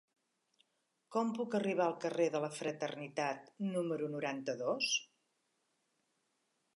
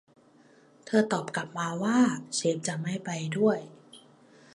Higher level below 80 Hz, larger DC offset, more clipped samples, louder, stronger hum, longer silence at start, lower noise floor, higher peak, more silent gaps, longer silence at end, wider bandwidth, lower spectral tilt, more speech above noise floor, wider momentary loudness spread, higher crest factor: second, under -90 dBFS vs -76 dBFS; neither; neither; second, -37 LUFS vs -28 LUFS; neither; first, 1.1 s vs 0.85 s; first, -82 dBFS vs -59 dBFS; second, -20 dBFS vs -10 dBFS; neither; first, 1.7 s vs 0.55 s; about the same, 11.5 kHz vs 11.5 kHz; about the same, -4 dB/octave vs -5 dB/octave; first, 45 dB vs 31 dB; second, 6 LU vs 9 LU; about the same, 18 dB vs 20 dB